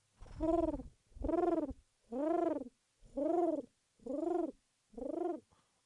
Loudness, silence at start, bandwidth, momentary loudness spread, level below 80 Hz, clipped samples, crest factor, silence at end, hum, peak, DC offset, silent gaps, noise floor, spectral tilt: -38 LUFS; 0.2 s; 10.5 kHz; 19 LU; -56 dBFS; under 0.1%; 16 dB; 0.45 s; none; -22 dBFS; under 0.1%; none; -60 dBFS; -8.5 dB/octave